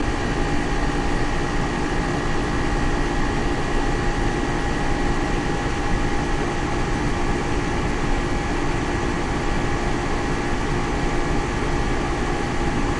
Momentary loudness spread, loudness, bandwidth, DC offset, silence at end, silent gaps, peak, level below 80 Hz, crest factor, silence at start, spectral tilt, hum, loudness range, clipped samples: 1 LU; -24 LUFS; 11 kHz; under 0.1%; 0 s; none; -8 dBFS; -26 dBFS; 14 dB; 0 s; -5.5 dB/octave; none; 0 LU; under 0.1%